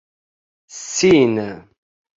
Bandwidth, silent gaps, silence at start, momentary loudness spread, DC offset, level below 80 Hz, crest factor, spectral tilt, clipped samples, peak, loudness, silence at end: 7.8 kHz; none; 0.75 s; 20 LU; under 0.1%; -54 dBFS; 18 dB; -4.5 dB/octave; under 0.1%; -2 dBFS; -16 LUFS; 0.6 s